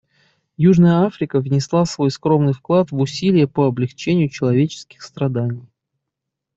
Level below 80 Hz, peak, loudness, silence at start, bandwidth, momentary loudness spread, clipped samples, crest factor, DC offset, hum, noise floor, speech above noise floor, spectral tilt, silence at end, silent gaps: -56 dBFS; -4 dBFS; -18 LUFS; 0.6 s; 7.8 kHz; 9 LU; under 0.1%; 14 dB; under 0.1%; none; -81 dBFS; 64 dB; -7.5 dB/octave; 0.95 s; none